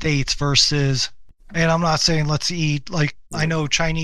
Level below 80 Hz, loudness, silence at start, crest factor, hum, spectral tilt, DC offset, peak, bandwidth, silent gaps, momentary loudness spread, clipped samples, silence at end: -36 dBFS; -19 LUFS; 0 s; 20 dB; none; -4 dB/octave; 1%; 0 dBFS; 12 kHz; none; 8 LU; under 0.1%; 0 s